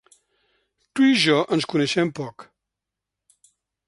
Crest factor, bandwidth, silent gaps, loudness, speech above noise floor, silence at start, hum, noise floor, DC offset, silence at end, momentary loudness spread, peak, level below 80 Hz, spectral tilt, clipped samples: 20 dB; 11.5 kHz; none; -20 LUFS; 65 dB; 0.95 s; none; -85 dBFS; under 0.1%; 1.45 s; 16 LU; -6 dBFS; -68 dBFS; -4.5 dB/octave; under 0.1%